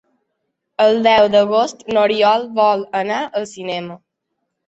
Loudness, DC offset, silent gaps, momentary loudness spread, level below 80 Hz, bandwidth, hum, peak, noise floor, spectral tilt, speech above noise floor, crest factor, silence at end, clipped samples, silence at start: -16 LUFS; under 0.1%; none; 13 LU; -58 dBFS; 8 kHz; none; -2 dBFS; -75 dBFS; -4.5 dB/octave; 59 dB; 16 dB; 0.7 s; under 0.1%; 0.8 s